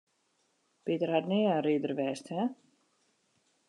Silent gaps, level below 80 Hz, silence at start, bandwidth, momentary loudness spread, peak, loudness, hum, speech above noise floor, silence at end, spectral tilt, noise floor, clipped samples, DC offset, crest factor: none; -88 dBFS; 0.85 s; 10.5 kHz; 8 LU; -14 dBFS; -31 LUFS; none; 44 dB; 1.15 s; -6.5 dB/octave; -75 dBFS; under 0.1%; under 0.1%; 20 dB